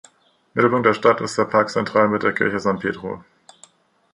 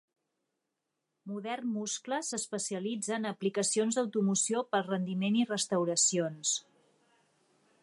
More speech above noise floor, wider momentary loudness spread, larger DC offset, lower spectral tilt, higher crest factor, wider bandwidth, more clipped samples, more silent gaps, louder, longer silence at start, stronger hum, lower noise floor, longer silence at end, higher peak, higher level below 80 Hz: second, 35 dB vs 53 dB; first, 12 LU vs 8 LU; neither; first, -5.5 dB/octave vs -3.5 dB/octave; about the same, 18 dB vs 18 dB; about the same, 11 kHz vs 11.5 kHz; neither; neither; first, -19 LUFS vs -31 LUFS; second, 0.55 s vs 1.25 s; neither; second, -54 dBFS vs -85 dBFS; second, 0.9 s vs 1.2 s; first, -2 dBFS vs -16 dBFS; first, -58 dBFS vs -84 dBFS